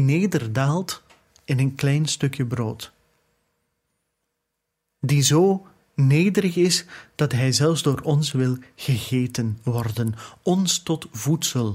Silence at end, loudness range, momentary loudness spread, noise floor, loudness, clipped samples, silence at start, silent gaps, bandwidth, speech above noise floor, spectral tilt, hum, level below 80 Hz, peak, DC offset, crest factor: 0 s; 6 LU; 10 LU; -79 dBFS; -22 LUFS; under 0.1%; 0 s; none; 16 kHz; 58 dB; -5 dB/octave; none; -58 dBFS; -4 dBFS; under 0.1%; 18 dB